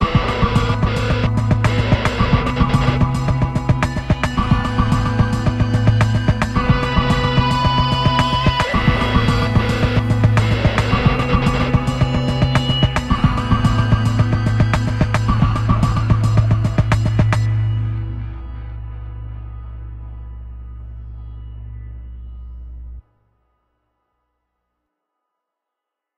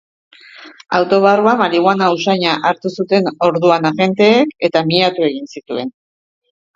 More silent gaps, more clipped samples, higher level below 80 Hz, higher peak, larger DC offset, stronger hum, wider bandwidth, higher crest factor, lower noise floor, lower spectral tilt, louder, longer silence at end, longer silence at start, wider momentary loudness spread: neither; neither; first, -26 dBFS vs -60 dBFS; about the same, 0 dBFS vs 0 dBFS; neither; first, 60 Hz at -30 dBFS vs none; first, 9.8 kHz vs 7.6 kHz; about the same, 16 dB vs 14 dB; first, -82 dBFS vs -39 dBFS; about the same, -6.5 dB/octave vs -6 dB/octave; second, -17 LUFS vs -14 LUFS; first, 3.2 s vs 0.85 s; second, 0 s vs 0.6 s; first, 19 LU vs 12 LU